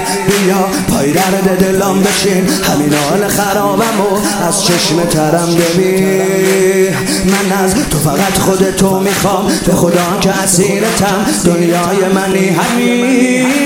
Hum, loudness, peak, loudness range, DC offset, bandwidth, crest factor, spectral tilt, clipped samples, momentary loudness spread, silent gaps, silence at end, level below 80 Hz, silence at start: none; -11 LUFS; 0 dBFS; 0 LU; under 0.1%; 17 kHz; 10 dB; -4.5 dB/octave; under 0.1%; 2 LU; none; 0 s; -36 dBFS; 0 s